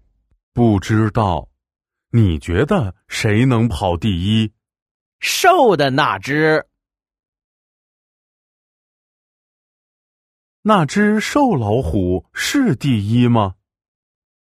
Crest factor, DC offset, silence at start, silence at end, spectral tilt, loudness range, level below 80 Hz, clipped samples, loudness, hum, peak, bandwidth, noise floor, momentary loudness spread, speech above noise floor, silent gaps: 18 dB; under 0.1%; 0.55 s; 0.95 s; -6 dB/octave; 6 LU; -40 dBFS; under 0.1%; -16 LUFS; none; 0 dBFS; 15 kHz; -81 dBFS; 7 LU; 66 dB; 4.82-5.19 s, 7.28-7.33 s, 7.44-10.63 s